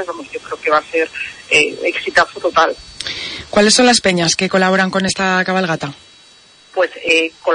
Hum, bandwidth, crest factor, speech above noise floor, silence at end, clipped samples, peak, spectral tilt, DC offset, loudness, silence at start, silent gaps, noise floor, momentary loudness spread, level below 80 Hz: none; 10.5 kHz; 16 dB; 30 dB; 0 s; under 0.1%; 0 dBFS; -3 dB/octave; under 0.1%; -15 LUFS; 0 s; none; -46 dBFS; 14 LU; -50 dBFS